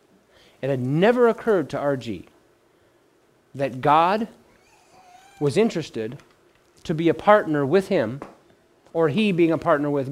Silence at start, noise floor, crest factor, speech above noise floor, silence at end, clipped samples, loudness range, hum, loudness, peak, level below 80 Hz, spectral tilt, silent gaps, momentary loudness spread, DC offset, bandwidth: 0.6 s; -60 dBFS; 22 dB; 39 dB; 0 s; under 0.1%; 5 LU; none; -21 LUFS; -2 dBFS; -60 dBFS; -7 dB/octave; none; 16 LU; under 0.1%; 14.5 kHz